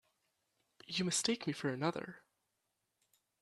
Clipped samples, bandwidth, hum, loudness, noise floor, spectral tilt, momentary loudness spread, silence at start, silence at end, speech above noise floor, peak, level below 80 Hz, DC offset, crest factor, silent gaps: under 0.1%; 13 kHz; none; -37 LUFS; -85 dBFS; -3.5 dB/octave; 11 LU; 0.9 s; 1.25 s; 48 dB; -18 dBFS; -80 dBFS; under 0.1%; 24 dB; none